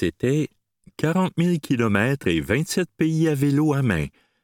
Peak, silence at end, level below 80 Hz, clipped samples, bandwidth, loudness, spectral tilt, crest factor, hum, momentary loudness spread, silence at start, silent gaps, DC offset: -4 dBFS; 0.35 s; -48 dBFS; under 0.1%; 17.5 kHz; -22 LUFS; -6.5 dB/octave; 18 dB; none; 5 LU; 0 s; none; under 0.1%